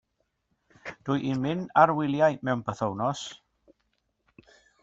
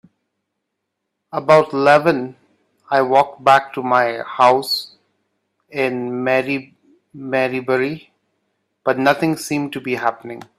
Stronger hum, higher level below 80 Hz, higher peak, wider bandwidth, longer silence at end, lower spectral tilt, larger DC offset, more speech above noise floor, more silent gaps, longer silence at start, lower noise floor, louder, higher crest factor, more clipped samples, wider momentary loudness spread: neither; about the same, -66 dBFS vs -64 dBFS; second, -6 dBFS vs 0 dBFS; second, 8 kHz vs 15 kHz; first, 1.45 s vs 0.15 s; first, -6.5 dB/octave vs -5 dB/octave; neither; second, 50 dB vs 60 dB; neither; second, 0.85 s vs 1.35 s; about the same, -76 dBFS vs -77 dBFS; second, -26 LUFS vs -17 LUFS; first, 24 dB vs 18 dB; neither; first, 17 LU vs 12 LU